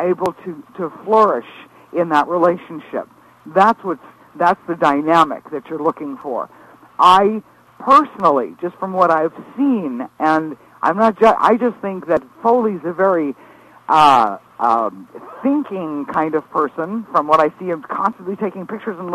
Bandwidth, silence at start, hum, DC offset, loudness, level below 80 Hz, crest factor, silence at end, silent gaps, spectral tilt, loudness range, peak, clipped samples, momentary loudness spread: 14 kHz; 0 s; none; under 0.1%; -17 LUFS; -60 dBFS; 16 dB; 0 s; none; -6 dB/octave; 4 LU; 0 dBFS; under 0.1%; 15 LU